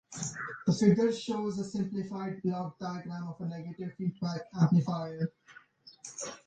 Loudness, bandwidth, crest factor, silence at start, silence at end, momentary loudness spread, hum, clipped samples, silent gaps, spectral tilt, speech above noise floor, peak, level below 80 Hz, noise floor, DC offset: -32 LUFS; 9.4 kHz; 20 dB; 0.1 s; 0.1 s; 14 LU; none; under 0.1%; none; -6.5 dB/octave; 21 dB; -12 dBFS; -70 dBFS; -52 dBFS; under 0.1%